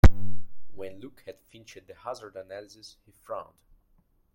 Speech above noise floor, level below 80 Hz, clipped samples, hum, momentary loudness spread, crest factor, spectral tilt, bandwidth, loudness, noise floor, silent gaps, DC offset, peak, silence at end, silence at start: 23 dB; -32 dBFS; under 0.1%; none; 10 LU; 22 dB; -7 dB/octave; 16.5 kHz; -35 LUFS; -65 dBFS; none; under 0.1%; -2 dBFS; 0.95 s; 0.05 s